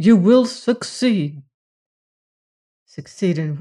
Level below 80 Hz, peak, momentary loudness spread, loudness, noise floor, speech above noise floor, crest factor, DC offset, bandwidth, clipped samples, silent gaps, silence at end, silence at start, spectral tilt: -64 dBFS; -4 dBFS; 18 LU; -18 LUFS; under -90 dBFS; over 73 dB; 16 dB; under 0.1%; 11 kHz; under 0.1%; 1.54-2.86 s; 0 s; 0 s; -6.5 dB/octave